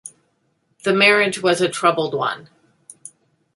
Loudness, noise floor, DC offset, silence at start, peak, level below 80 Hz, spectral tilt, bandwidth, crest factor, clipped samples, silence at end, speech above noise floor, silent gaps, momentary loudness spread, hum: -17 LUFS; -67 dBFS; under 0.1%; 0.05 s; -2 dBFS; -68 dBFS; -3.5 dB/octave; 11.5 kHz; 20 dB; under 0.1%; 1.15 s; 49 dB; none; 25 LU; none